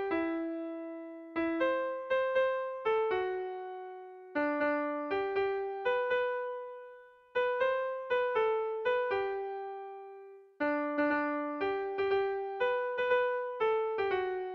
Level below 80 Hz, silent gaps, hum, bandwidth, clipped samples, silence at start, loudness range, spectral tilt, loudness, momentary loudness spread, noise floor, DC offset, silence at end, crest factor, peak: -70 dBFS; none; none; 6 kHz; under 0.1%; 0 s; 2 LU; -6 dB/octave; -33 LUFS; 12 LU; -54 dBFS; under 0.1%; 0 s; 14 dB; -18 dBFS